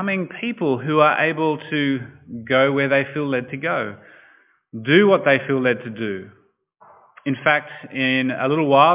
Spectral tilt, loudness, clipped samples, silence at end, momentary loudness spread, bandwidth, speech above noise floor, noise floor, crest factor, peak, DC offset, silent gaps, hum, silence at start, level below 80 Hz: -9.5 dB/octave; -19 LUFS; under 0.1%; 0 s; 14 LU; 3.9 kHz; 36 dB; -55 dBFS; 20 dB; -2 dBFS; under 0.1%; none; none; 0 s; -64 dBFS